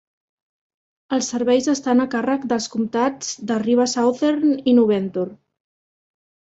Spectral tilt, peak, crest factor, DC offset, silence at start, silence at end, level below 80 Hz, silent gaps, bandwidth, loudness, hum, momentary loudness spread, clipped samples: -4.5 dB/octave; -6 dBFS; 16 dB; under 0.1%; 1.1 s; 1.15 s; -64 dBFS; none; 8 kHz; -20 LUFS; none; 8 LU; under 0.1%